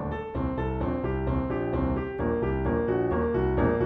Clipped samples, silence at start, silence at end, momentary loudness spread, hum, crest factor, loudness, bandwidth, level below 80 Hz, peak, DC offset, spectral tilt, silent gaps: under 0.1%; 0 s; 0 s; 4 LU; none; 14 dB; -28 LUFS; 4.6 kHz; -36 dBFS; -12 dBFS; under 0.1%; -11 dB/octave; none